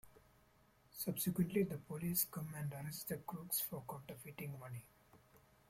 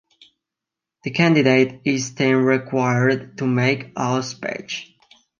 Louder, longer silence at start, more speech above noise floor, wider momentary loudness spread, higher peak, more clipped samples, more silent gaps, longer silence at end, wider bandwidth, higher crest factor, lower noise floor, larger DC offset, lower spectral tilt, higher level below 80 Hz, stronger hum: second, -42 LUFS vs -20 LUFS; second, 0.05 s vs 1.05 s; second, 29 dB vs 67 dB; about the same, 13 LU vs 13 LU; second, -22 dBFS vs -2 dBFS; neither; neither; second, 0.3 s vs 0.55 s; first, 16.5 kHz vs 7.4 kHz; about the same, 22 dB vs 18 dB; second, -71 dBFS vs -86 dBFS; neither; about the same, -5 dB/octave vs -5.5 dB/octave; second, -72 dBFS vs -64 dBFS; neither